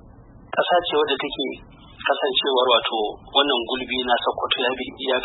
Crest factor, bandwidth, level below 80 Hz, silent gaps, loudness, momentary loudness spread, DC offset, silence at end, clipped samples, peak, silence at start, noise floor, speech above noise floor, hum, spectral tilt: 18 dB; 4.1 kHz; -52 dBFS; none; -21 LUFS; 9 LU; under 0.1%; 0 s; under 0.1%; -4 dBFS; 0.05 s; -46 dBFS; 24 dB; none; -8 dB/octave